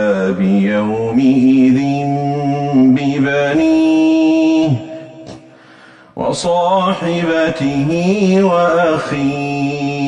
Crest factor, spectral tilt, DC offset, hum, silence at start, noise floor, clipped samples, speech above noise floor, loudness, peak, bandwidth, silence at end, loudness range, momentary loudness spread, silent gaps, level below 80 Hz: 12 dB; -7 dB/octave; under 0.1%; none; 0 s; -42 dBFS; under 0.1%; 29 dB; -14 LUFS; -2 dBFS; 10 kHz; 0 s; 4 LU; 7 LU; none; -48 dBFS